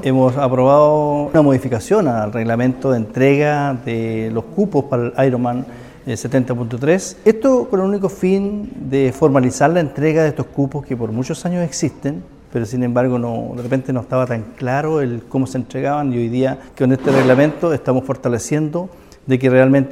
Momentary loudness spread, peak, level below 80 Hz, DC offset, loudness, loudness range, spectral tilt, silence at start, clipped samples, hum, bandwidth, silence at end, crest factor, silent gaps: 9 LU; 0 dBFS; -46 dBFS; 0.1%; -17 LUFS; 5 LU; -7 dB/octave; 0 s; under 0.1%; none; 14 kHz; 0 s; 16 dB; none